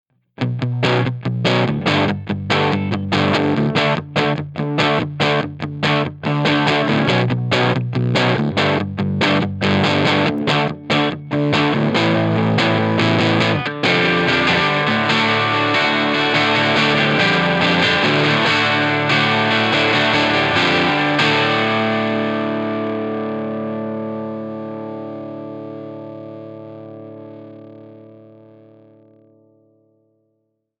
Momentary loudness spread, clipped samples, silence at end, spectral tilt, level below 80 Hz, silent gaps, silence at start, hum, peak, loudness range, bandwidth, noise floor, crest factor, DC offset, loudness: 14 LU; under 0.1%; 2.65 s; -5.5 dB/octave; -54 dBFS; none; 0.4 s; none; 0 dBFS; 13 LU; 10.5 kHz; -70 dBFS; 18 dB; under 0.1%; -16 LUFS